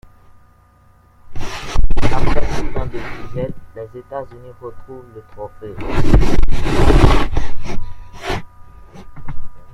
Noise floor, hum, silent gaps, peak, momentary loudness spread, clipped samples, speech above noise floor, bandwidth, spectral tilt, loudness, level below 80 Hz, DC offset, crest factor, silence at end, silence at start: -50 dBFS; none; none; 0 dBFS; 22 LU; under 0.1%; 37 dB; 7.6 kHz; -6.5 dB/octave; -20 LUFS; -20 dBFS; under 0.1%; 12 dB; 0.15 s; 1.3 s